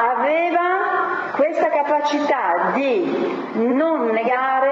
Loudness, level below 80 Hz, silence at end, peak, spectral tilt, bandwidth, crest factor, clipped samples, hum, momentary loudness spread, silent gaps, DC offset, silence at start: -19 LUFS; -74 dBFS; 0 s; -6 dBFS; -5.5 dB/octave; 7.8 kHz; 12 dB; under 0.1%; none; 4 LU; none; under 0.1%; 0 s